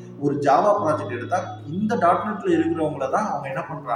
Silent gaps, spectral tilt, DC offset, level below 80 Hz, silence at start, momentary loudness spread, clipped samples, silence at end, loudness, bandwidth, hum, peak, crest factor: none; -7 dB/octave; under 0.1%; -62 dBFS; 0 s; 9 LU; under 0.1%; 0 s; -22 LUFS; 11 kHz; none; -6 dBFS; 16 dB